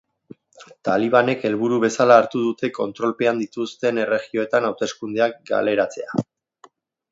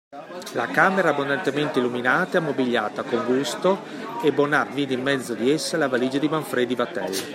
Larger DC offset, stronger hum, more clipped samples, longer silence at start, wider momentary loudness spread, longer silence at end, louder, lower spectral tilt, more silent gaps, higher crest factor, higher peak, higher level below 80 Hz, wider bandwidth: neither; neither; neither; first, 0.6 s vs 0.1 s; first, 12 LU vs 6 LU; first, 0.9 s vs 0 s; about the same, -21 LUFS vs -23 LUFS; about the same, -5.5 dB/octave vs -4.5 dB/octave; neither; about the same, 20 dB vs 20 dB; first, 0 dBFS vs -4 dBFS; about the same, -68 dBFS vs -72 dBFS; second, 7.8 kHz vs 16 kHz